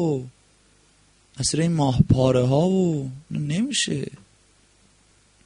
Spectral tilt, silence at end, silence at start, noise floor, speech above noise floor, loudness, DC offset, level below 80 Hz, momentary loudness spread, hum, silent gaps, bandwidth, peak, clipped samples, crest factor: -5.5 dB/octave; 1.3 s; 0 s; -59 dBFS; 37 dB; -22 LUFS; under 0.1%; -44 dBFS; 12 LU; none; none; 10.5 kHz; -4 dBFS; under 0.1%; 20 dB